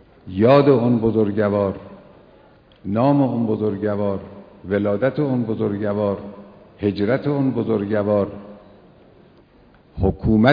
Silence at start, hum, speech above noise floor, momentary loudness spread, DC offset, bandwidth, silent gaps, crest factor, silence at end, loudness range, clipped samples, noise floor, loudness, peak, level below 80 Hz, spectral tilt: 0.25 s; none; 33 dB; 14 LU; under 0.1%; 5.2 kHz; none; 20 dB; 0 s; 4 LU; under 0.1%; -51 dBFS; -20 LUFS; 0 dBFS; -42 dBFS; -10.5 dB/octave